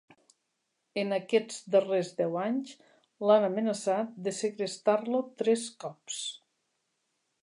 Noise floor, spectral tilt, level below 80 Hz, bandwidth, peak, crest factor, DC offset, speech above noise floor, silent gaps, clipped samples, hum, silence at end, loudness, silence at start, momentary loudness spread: -80 dBFS; -4.5 dB/octave; -86 dBFS; 11.5 kHz; -10 dBFS; 20 dB; under 0.1%; 51 dB; none; under 0.1%; none; 1.1 s; -30 LUFS; 0.95 s; 13 LU